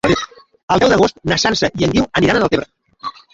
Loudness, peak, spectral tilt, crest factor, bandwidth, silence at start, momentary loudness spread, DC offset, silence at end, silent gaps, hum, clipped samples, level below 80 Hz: -15 LUFS; 0 dBFS; -4.5 dB/octave; 16 dB; 11 kHz; 0.05 s; 17 LU; under 0.1%; 0.25 s; 0.63-0.68 s; none; under 0.1%; -40 dBFS